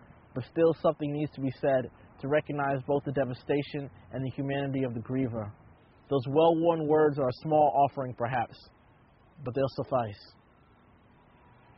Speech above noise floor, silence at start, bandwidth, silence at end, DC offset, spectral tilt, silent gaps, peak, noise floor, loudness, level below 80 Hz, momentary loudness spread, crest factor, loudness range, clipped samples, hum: 32 dB; 0.35 s; 5.8 kHz; 1.55 s; under 0.1%; -6.5 dB/octave; none; -12 dBFS; -60 dBFS; -29 LUFS; -62 dBFS; 14 LU; 18 dB; 7 LU; under 0.1%; none